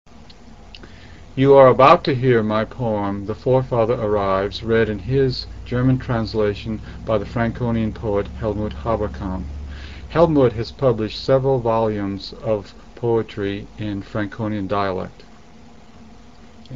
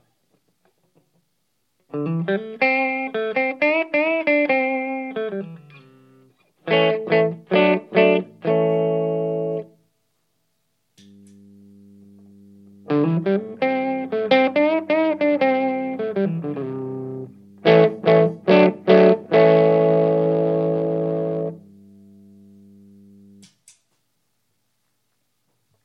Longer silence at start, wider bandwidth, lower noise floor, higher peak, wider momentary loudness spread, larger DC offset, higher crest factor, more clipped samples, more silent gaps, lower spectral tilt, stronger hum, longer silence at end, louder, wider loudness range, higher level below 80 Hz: second, 0.2 s vs 1.95 s; first, 7.4 kHz vs 6 kHz; second, -45 dBFS vs -72 dBFS; about the same, 0 dBFS vs 0 dBFS; about the same, 13 LU vs 13 LU; first, 0.6% vs under 0.1%; about the same, 20 dB vs 20 dB; neither; neither; about the same, -8 dB/octave vs -8.5 dB/octave; second, none vs 50 Hz at -50 dBFS; second, 0 s vs 4.25 s; about the same, -20 LUFS vs -19 LUFS; second, 8 LU vs 11 LU; first, -38 dBFS vs -74 dBFS